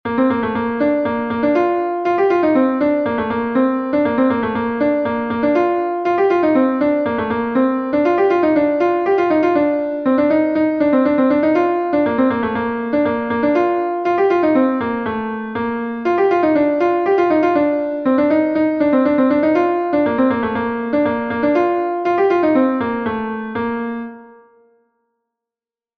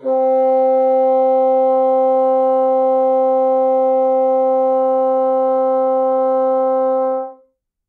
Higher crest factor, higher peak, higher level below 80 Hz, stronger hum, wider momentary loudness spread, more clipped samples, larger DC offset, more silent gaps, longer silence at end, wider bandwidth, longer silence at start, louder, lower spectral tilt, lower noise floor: first, 14 dB vs 8 dB; about the same, -4 dBFS vs -6 dBFS; first, -52 dBFS vs -82 dBFS; neither; first, 6 LU vs 2 LU; neither; neither; neither; first, 1.7 s vs 0.55 s; first, 6.2 kHz vs 3.3 kHz; about the same, 0.05 s vs 0 s; about the same, -17 LUFS vs -15 LUFS; about the same, -8 dB/octave vs -7 dB/octave; first, -90 dBFS vs -57 dBFS